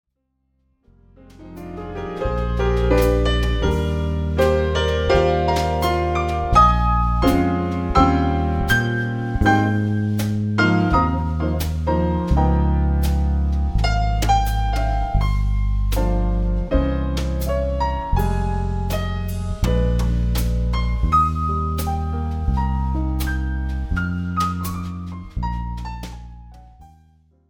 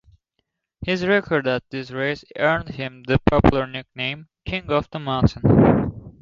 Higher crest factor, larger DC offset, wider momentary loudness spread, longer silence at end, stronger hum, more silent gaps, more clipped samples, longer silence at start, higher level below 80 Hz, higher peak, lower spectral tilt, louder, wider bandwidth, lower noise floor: about the same, 18 dB vs 20 dB; neither; second, 9 LU vs 14 LU; first, 0.65 s vs 0.1 s; neither; neither; neither; first, 1.4 s vs 0.8 s; first, -24 dBFS vs -36 dBFS; about the same, 0 dBFS vs 0 dBFS; second, -6.5 dB/octave vs -8 dB/octave; about the same, -21 LUFS vs -21 LUFS; first, 18 kHz vs 7.4 kHz; second, -70 dBFS vs -75 dBFS